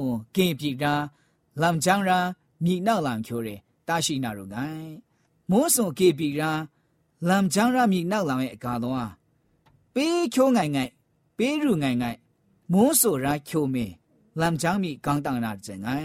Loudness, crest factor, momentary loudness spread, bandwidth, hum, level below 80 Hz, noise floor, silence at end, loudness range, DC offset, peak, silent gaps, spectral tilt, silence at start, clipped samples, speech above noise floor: -25 LUFS; 18 dB; 13 LU; 16 kHz; none; -58 dBFS; -64 dBFS; 0 s; 3 LU; under 0.1%; -6 dBFS; none; -4.5 dB/octave; 0 s; under 0.1%; 40 dB